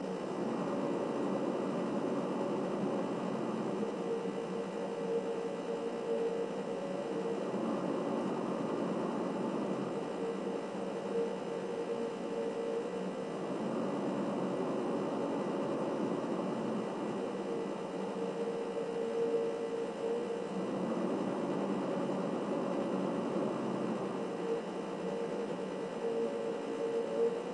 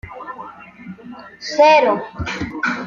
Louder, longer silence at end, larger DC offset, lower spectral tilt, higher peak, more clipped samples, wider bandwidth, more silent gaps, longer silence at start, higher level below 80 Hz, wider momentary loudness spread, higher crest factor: second, -36 LUFS vs -16 LUFS; about the same, 0 s vs 0 s; neither; first, -6.5 dB/octave vs -4.5 dB/octave; second, -22 dBFS vs -2 dBFS; neither; first, 11 kHz vs 7.4 kHz; neither; about the same, 0 s vs 0.05 s; second, -82 dBFS vs -46 dBFS; second, 3 LU vs 25 LU; about the same, 14 dB vs 18 dB